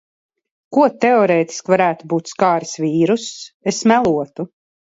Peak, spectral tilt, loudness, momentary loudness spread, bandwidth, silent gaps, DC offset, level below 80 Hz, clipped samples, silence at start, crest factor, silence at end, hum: -2 dBFS; -5 dB/octave; -17 LUFS; 11 LU; 8 kHz; 3.54-3.60 s; under 0.1%; -60 dBFS; under 0.1%; 0.7 s; 16 dB; 0.45 s; none